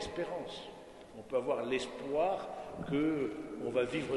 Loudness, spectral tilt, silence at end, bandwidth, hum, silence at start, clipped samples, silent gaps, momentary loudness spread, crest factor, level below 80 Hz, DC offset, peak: -36 LUFS; -5.5 dB/octave; 0 s; 11.5 kHz; none; 0 s; under 0.1%; none; 14 LU; 16 dB; -62 dBFS; under 0.1%; -20 dBFS